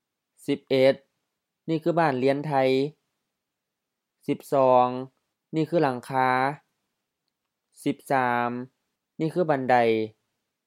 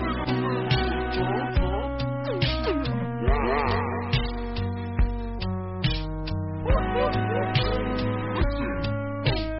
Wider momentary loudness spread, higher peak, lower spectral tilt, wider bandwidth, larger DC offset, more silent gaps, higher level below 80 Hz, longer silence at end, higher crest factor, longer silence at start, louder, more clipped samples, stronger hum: first, 15 LU vs 6 LU; first, -6 dBFS vs -12 dBFS; first, -7 dB/octave vs -5 dB/octave; first, 15 kHz vs 5.8 kHz; neither; neither; second, -80 dBFS vs -32 dBFS; first, 0.55 s vs 0 s; first, 20 dB vs 14 dB; first, 0.5 s vs 0 s; about the same, -25 LUFS vs -27 LUFS; neither; neither